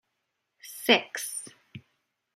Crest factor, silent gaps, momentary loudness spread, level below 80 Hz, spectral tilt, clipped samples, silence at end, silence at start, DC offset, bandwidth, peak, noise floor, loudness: 28 dB; none; 21 LU; -80 dBFS; -1.5 dB/octave; under 0.1%; 0.55 s; 0.65 s; under 0.1%; 16 kHz; -4 dBFS; -81 dBFS; -26 LUFS